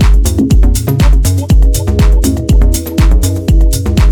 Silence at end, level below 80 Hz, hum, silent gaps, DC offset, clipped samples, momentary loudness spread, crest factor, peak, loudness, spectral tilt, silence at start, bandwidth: 0 s; -8 dBFS; none; none; under 0.1%; under 0.1%; 2 LU; 6 dB; 0 dBFS; -11 LUFS; -6 dB/octave; 0 s; 18.5 kHz